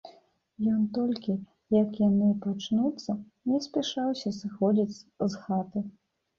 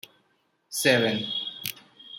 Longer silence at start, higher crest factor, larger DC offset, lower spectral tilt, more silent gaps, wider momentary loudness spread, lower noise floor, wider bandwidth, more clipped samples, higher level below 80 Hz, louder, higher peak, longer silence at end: second, 0.05 s vs 0.7 s; second, 16 dB vs 22 dB; neither; first, -7 dB/octave vs -3 dB/octave; neither; second, 10 LU vs 14 LU; second, -59 dBFS vs -70 dBFS; second, 7.2 kHz vs 16.5 kHz; neither; first, -66 dBFS vs -74 dBFS; second, -29 LUFS vs -26 LUFS; second, -12 dBFS vs -6 dBFS; first, 0.5 s vs 0 s